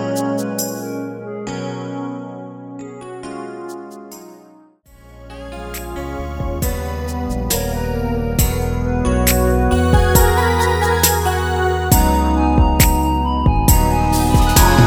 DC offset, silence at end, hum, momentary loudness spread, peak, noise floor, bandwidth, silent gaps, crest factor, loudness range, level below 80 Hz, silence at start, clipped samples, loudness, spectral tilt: under 0.1%; 0 s; none; 18 LU; 0 dBFS; -47 dBFS; over 20 kHz; none; 16 dB; 16 LU; -22 dBFS; 0 s; under 0.1%; -17 LUFS; -5 dB/octave